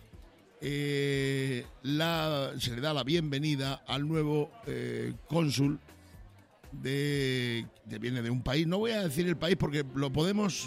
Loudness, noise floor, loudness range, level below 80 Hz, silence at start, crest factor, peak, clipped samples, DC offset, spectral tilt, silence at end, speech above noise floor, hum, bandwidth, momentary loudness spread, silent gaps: -32 LUFS; -55 dBFS; 2 LU; -56 dBFS; 0 s; 20 dB; -12 dBFS; under 0.1%; under 0.1%; -5.5 dB/octave; 0 s; 24 dB; none; 16 kHz; 8 LU; none